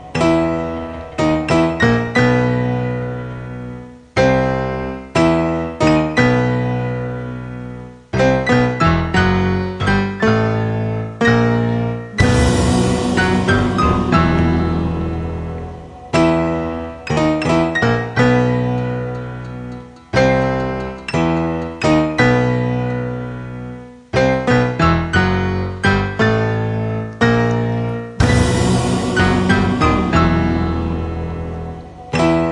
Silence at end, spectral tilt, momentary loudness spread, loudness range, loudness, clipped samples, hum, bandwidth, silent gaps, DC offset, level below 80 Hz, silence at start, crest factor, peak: 0 s; -6.5 dB/octave; 13 LU; 3 LU; -17 LUFS; under 0.1%; none; 11.5 kHz; none; under 0.1%; -32 dBFS; 0 s; 16 dB; 0 dBFS